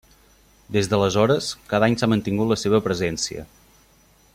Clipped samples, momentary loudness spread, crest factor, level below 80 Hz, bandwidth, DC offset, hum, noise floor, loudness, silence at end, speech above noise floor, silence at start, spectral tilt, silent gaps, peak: under 0.1%; 7 LU; 18 dB; -50 dBFS; 16 kHz; under 0.1%; none; -56 dBFS; -21 LUFS; 0.9 s; 35 dB; 0.7 s; -5 dB/octave; none; -4 dBFS